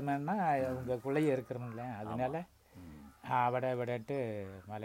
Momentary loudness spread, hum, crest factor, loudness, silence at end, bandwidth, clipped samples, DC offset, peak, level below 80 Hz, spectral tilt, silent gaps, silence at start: 19 LU; none; 18 dB; -36 LUFS; 0 s; 16 kHz; under 0.1%; under 0.1%; -18 dBFS; -66 dBFS; -7.5 dB/octave; none; 0 s